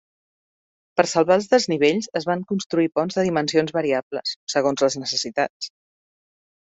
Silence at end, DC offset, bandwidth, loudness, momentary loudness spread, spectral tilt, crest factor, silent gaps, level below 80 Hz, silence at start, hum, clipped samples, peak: 1.1 s; under 0.1%; 8.2 kHz; -21 LUFS; 9 LU; -4 dB/octave; 20 dB; 2.66-2.70 s, 4.03-4.11 s, 4.36-4.47 s, 5.50-5.60 s; -66 dBFS; 0.95 s; none; under 0.1%; -2 dBFS